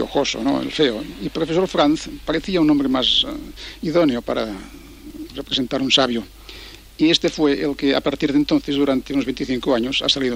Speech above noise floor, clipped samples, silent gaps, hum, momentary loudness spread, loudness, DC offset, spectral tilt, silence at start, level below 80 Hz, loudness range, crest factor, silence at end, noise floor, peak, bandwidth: 19 dB; under 0.1%; none; none; 18 LU; -19 LUFS; under 0.1%; -4.5 dB/octave; 0 s; -42 dBFS; 3 LU; 18 dB; 0 s; -39 dBFS; -2 dBFS; 16 kHz